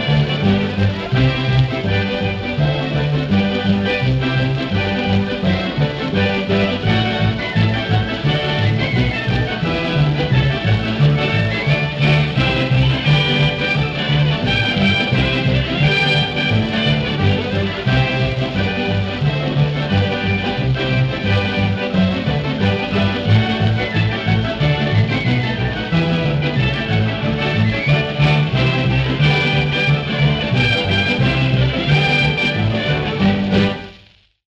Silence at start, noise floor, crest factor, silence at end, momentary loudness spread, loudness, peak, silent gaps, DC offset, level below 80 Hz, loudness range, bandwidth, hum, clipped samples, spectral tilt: 0 s; -49 dBFS; 14 dB; 0.65 s; 4 LU; -17 LUFS; -2 dBFS; none; under 0.1%; -34 dBFS; 2 LU; 7.6 kHz; none; under 0.1%; -7 dB/octave